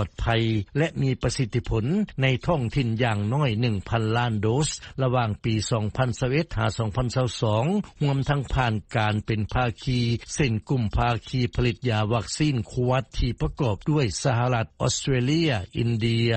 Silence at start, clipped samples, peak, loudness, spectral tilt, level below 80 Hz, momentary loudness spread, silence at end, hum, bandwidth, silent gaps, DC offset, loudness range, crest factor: 0 s; under 0.1%; -8 dBFS; -25 LUFS; -6 dB/octave; -38 dBFS; 3 LU; 0 s; none; 8.8 kHz; none; under 0.1%; 1 LU; 16 dB